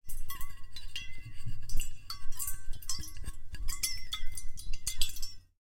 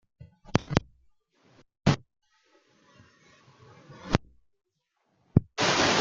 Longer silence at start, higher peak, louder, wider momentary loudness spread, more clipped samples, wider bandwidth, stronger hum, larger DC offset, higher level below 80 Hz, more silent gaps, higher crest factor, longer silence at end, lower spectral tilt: second, 0.05 s vs 0.2 s; second, -8 dBFS vs -2 dBFS; second, -40 LUFS vs -28 LUFS; first, 11 LU vs 7 LU; neither; first, 17 kHz vs 9.2 kHz; neither; neither; first, -38 dBFS vs -48 dBFS; neither; second, 20 dB vs 28 dB; first, 0.2 s vs 0 s; second, -1 dB/octave vs -4.5 dB/octave